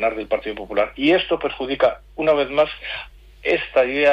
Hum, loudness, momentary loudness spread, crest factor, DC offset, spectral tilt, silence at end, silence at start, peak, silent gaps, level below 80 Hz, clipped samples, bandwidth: none; -21 LUFS; 11 LU; 14 dB; under 0.1%; -6 dB/octave; 0 s; 0 s; -6 dBFS; none; -46 dBFS; under 0.1%; 7.2 kHz